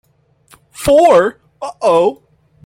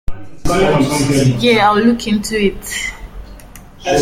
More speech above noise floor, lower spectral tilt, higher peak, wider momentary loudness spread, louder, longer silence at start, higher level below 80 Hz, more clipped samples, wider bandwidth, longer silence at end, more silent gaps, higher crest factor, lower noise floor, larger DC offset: first, 42 dB vs 23 dB; about the same, -5 dB/octave vs -5 dB/octave; about the same, -2 dBFS vs 0 dBFS; about the same, 16 LU vs 15 LU; about the same, -12 LUFS vs -14 LUFS; first, 0.8 s vs 0.1 s; second, -44 dBFS vs -32 dBFS; neither; about the same, 16.5 kHz vs 16.5 kHz; first, 0.55 s vs 0 s; neither; about the same, 14 dB vs 14 dB; first, -53 dBFS vs -36 dBFS; neither